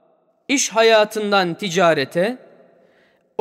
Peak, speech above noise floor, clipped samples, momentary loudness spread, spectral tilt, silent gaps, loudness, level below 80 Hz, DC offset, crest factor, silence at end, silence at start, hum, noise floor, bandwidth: -4 dBFS; 41 dB; under 0.1%; 9 LU; -3 dB/octave; none; -17 LUFS; -72 dBFS; under 0.1%; 16 dB; 1.05 s; 0.5 s; none; -58 dBFS; 16 kHz